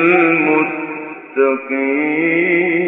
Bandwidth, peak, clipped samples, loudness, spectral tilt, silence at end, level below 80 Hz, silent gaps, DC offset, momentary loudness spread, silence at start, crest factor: 3.9 kHz; -2 dBFS; under 0.1%; -15 LUFS; -9 dB/octave; 0 s; -74 dBFS; none; under 0.1%; 12 LU; 0 s; 14 dB